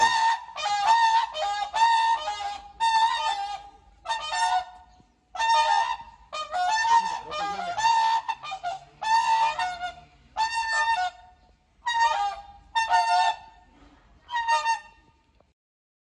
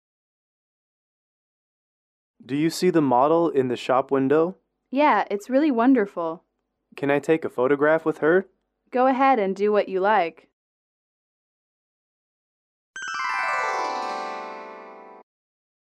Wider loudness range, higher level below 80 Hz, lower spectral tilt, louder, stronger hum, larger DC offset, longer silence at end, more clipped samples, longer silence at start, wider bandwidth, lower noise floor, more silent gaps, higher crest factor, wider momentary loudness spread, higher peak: second, 4 LU vs 8 LU; first, -60 dBFS vs -76 dBFS; second, 0.5 dB/octave vs -6 dB/octave; second, -25 LUFS vs -22 LUFS; neither; neither; first, 1.25 s vs 0.85 s; neither; second, 0 s vs 2.45 s; second, 10 kHz vs 13.5 kHz; about the same, -62 dBFS vs -61 dBFS; second, none vs 10.53-12.94 s; about the same, 18 dB vs 16 dB; about the same, 14 LU vs 12 LU; about the same, -8 dBFS vs -8 dBFS